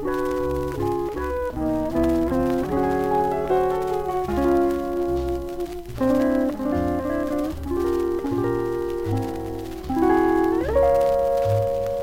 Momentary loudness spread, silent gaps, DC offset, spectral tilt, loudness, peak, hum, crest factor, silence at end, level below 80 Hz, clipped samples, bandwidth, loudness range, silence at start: 7 LU; none; under 0.1%; -7.5 dB/octave; -23 LUFS; -8 dBFS; none; 14 dB; 0 s; -38 dBFS; under 0.1%; 17 kHz; 3 LU; 0 s